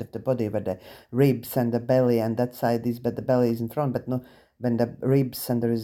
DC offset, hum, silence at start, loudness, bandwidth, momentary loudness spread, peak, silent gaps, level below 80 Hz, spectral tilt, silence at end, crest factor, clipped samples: under 0.1%; none; 0 s; -25 LUFS; 17 kHz; 9 LU; -8 dBFS; none; -60 dBFS; -7.5 dB/octave; 0 s; 16 dB; under 0.1%